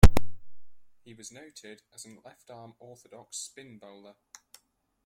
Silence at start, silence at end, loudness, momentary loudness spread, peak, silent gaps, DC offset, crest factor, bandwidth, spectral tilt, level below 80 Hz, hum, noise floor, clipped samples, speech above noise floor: 0.05 s; 1.65 s; -35 LUFS; 14 LU; -2 dBFS; none; under 0.1%; 24 dB; 16.5 kHz; -5.5 dB/octave; -34 dBFS; none; -68 dBFS; under 0.1%; 20 dB